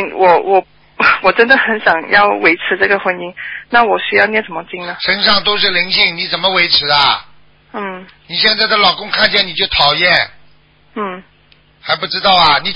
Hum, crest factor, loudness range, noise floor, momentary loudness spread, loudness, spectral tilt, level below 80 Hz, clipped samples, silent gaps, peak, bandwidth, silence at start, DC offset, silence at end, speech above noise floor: none; 14 dB; 2 LU; -49 dBFS; 15 LU; -11 LUFS; -5 dB/octave; -46 dBFS; under 0.1%; none; 0 dBFS; 8 kHz; 0 s; under 0.1%; 0 s; 36 dB